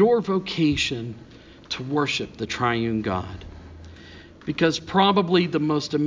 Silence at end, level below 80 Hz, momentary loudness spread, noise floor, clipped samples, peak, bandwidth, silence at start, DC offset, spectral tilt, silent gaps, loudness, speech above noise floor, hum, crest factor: 0 s; -48 dBFS; 23 LU; -45 dBFS; under 0.1%; -6 dBFS; 7.6 kHz; 0 s; under 0.1%; -5.5 dB/octave; none; -23 LUFS; 22 dB; none; 18 dB